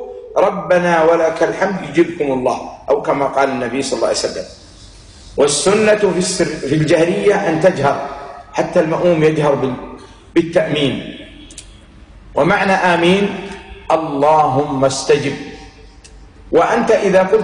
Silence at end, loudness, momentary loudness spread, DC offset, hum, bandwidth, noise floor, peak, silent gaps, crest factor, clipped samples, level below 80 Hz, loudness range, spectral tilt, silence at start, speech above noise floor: 0 s; -15 LUFS; 15 LU; under 0.1%; none; 10.5 kHz; -40 dBFS; -4 dBFS; none; 12 dB; under 0.1%; -44 dBFS; 3 LU; -5 dB/octave; 0 s; 26 dB